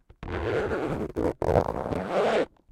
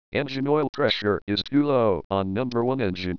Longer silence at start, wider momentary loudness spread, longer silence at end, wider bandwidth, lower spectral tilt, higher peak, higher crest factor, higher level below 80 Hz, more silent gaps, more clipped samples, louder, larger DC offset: about the same, 0.2 s vs 0.1 s; about the same, 6 LU vs 5 LU; first, 0.25 s vs 0 s; first, 15.5 kHz vs 5.4 kHz; about the same, -7 dB/octave vs -7.5 dB/octave; about the same, -8 dBFS vs -8 dBFS; about the same, 20 dB vs 16 dB; first, -42 dBFS vs -54 dBFS; second, none vs 0.69-0.73 s, 1.22-1.27 s, 2.04-2.10 s; neither; second, -28 LUFS vs -24 LUFS; second, under 0.1% vs 0.5%